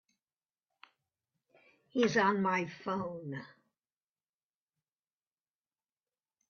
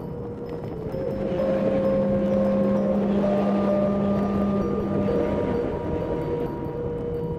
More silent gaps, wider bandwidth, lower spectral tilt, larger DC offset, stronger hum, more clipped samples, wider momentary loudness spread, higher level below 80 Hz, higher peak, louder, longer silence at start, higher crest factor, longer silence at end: neither; about the same, 7 kHz vs 6.4 kHz; second, -4 dB/octave vs -9.5 dB/octave; neither; neither; neither; first, 15 LU vs 8 LU; second, -80 dBFS vs -42 dBFS; second, -14 dBFS vs -10 dBFS; second, -33 LUFS vs -24 LUFS; first, 1.95 s vs 0 s; first, 24 dB vs 12 dB; first, 3.05 s vs 0 s